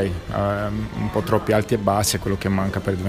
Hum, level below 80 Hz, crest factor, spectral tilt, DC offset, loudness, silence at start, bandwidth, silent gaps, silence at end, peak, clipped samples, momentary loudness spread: none; -38 dBFS; 18 dB; -5.5 dB/octave; under 0.1%; -22 LUFS; 0 s; 15.5 kHz; none; 0 s; -4 dBFS; under 0.1%; 5 LU